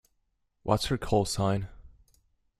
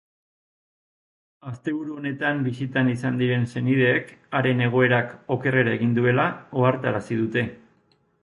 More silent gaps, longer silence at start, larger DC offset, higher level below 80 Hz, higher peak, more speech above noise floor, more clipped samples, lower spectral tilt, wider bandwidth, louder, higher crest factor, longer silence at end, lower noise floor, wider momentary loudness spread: neither; second, 0.65 s vs 1.45 s; neither; first, -48 dBFS vs -60 dBFS; second, -10 dBFS vs -6 dBFS; first, 48 dB vs 41 dB; neither; second, -5.5 dB/octave vs -8 dB/octave; first, 14 kHz vs 11 kHz; second, -29 LUFS vs -23 LUFS; about the same, 22 dB vs 18 dB; about the same, 0.75 s vs 0.65 s; first, -75 dBFS vs -64 dBFS; about the same, 11 LU vs 9 LU